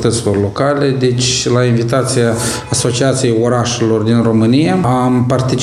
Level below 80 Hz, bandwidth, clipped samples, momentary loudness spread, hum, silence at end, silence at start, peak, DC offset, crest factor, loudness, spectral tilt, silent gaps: -42 dBFS; 14 kHz; under 0.1%; 3 LU; none; 0 s; 0 s; 0 dBFS; under 0.1%; 12 dB; -13 LUFS; -5 dB/octave; none